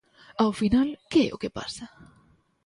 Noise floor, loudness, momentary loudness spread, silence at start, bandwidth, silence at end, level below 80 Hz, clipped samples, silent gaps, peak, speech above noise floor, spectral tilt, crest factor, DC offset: -62 dBFS; -26 LUFS; 17 LU; 0.4 s; 11.5 kHz; 0.6 s; -50 dBFS; under 0.1%; none; -10 dBFS; 37 dB; -5.5 dB/octave; 18 dB; under 0.1%